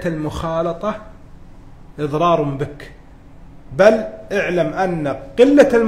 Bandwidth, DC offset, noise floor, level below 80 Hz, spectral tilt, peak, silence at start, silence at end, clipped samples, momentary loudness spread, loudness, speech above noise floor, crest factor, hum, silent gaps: 13.5 kHz; under 0.1%; -40 dBFS; -40 dBFS; -6.5 dB/octave; 0 dBFS; 0 s; 0 s; under 0.1%; 14 LU; -17 LUFS; 23 dB; 18 dB; none; none